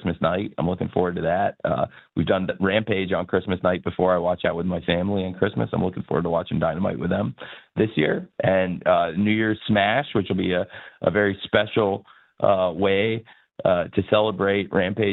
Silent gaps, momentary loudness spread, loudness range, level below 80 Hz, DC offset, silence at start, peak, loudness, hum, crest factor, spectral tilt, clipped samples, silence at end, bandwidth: none; 5 LU; 2 LU; -52 dBFS; under 0.1%; 0 s; -2 dBFS; -23 LUFS; none; 20 dB; -9.5 dB/octave; under 0.1%; 0 s; 4.2 kHz